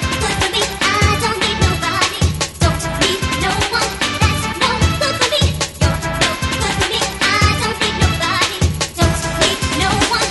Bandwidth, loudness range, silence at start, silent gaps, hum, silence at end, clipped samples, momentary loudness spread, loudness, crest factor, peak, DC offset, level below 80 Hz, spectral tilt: 12 kHz; 1 LU; 0 s; none; none; 0 s; under 0.1%; 3 LU; -16 LUFS; 16 dB; 0 dBFS; under 0.1%; -26 dBFS; -3.5 dB/octave